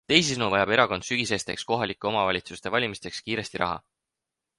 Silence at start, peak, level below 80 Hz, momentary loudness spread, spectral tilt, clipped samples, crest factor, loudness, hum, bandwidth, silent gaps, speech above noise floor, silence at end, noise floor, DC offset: 0.1 s; -2 dBFS; -56 dBFS; 9 LU; -3.5 dB/octave; under 0.1%; 26 dB; -26 LUFS; none; 11.5 kHz; none; 60 dB; 0.8 s; -86 dBFS; under 0.1%